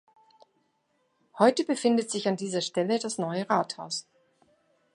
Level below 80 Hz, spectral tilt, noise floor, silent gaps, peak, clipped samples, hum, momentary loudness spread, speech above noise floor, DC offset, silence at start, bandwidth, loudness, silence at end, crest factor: -82 dBFS; -4.5 dB/octave; -73 dBFS; none; -6 dBFS; under 0.1%; none; 9 LU; 46 dB; under 0.1%; 1.35 s; 11.5 kHz; -27 LUFS; 0.95 s; 24 dB